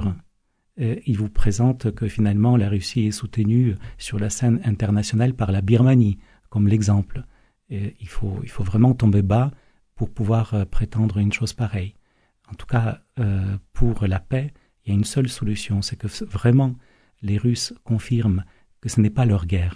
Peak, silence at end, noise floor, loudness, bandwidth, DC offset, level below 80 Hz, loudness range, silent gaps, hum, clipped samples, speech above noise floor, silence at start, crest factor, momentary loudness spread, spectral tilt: -4 dBFS; 0 s; -65 dBFS; -22 LUFS; 11 kHz; under 0.1%; -34 dBFS; 5 LU; none; none; under 0.1%; 45 dB; 0 s; 18 dB; 12 LU; -7 dB/octave